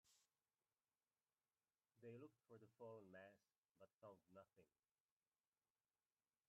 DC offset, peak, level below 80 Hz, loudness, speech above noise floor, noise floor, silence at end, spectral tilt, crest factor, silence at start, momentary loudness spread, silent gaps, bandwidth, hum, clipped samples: under 0.1%; -50 dBFS; under -90 dBFS; -65 LUFS; over 24 dB; under -90 dBFS; 1.8 s; -6 dB/octave; 18 dB; 0.05 s; 6 LU; 3.58-3.62 s, 3.94-3.99 s; 4.2 kHz; none; under 0.1%